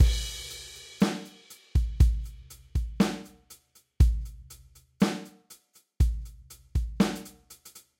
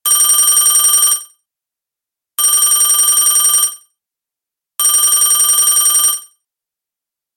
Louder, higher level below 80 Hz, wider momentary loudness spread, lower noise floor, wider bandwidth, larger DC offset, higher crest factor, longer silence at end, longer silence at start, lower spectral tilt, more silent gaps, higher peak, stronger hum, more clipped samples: second, -29 LUFS vs -9 LUFS; first, -32 dBFS vs -58 dBFS; first, 23 LU vs 8 LU; second, -57 dBFS vs -85 dBFS; about the same, 16 kHz vs 17 kHz; neither; first, 20 dB vs 14 dB; second, 0.2 s vs 1.15 s; about the same, 0 s vs 0.05 s; first, -6 dB/octave vs 4.5 dB/octave; neither; second, -8 dBFS vs 0 dBFS; neither; neither